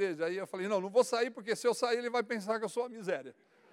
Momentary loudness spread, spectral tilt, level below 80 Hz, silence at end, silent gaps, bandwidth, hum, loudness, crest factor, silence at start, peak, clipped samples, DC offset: 8 LU; -4 dB/octave; under -90 dBFS; 0.4 s; none; 15.5 kHz; none; -33 LUFS; 18 dB; 0 s; -16 dBFS; under 0.1%; under 0.1%